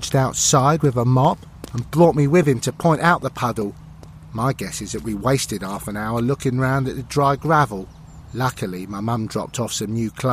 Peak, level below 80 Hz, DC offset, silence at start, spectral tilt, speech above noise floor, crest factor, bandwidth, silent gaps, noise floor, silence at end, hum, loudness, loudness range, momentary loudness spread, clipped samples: -2 dBFS; -44 dBFS; under 0.1%; 0 s; -5.5 dB/octave; 21 dB; 18 dB; 15.5 kHz; none; -40 dBFS; 0 s; none; -20 LUFS; 6 LU; 12 LU; under 0.1%